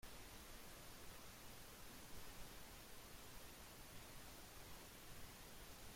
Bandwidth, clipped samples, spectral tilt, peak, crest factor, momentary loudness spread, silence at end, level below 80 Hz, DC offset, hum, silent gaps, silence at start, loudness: 16.5 kHz; under 0.1%; -2.5 dB/octave; -42 dBFS; 14 dB; 1 LU; 0 s; -64 dBFS; under 0.1%; none; none; 0 s; -58 LUFS